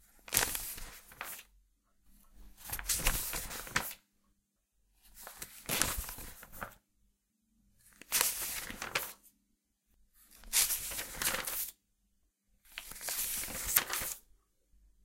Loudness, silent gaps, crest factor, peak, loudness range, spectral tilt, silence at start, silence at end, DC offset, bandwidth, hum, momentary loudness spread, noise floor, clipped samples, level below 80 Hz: -34 LUFS; none; 36 dB; -4 dBFS; 5 LU; -0.5 dB/octave; 0.3 s; 0.85 s; under 0.1%; 17 kHz; none; 18 LU; -79 dBFS; under 0.1%; -52 dBFS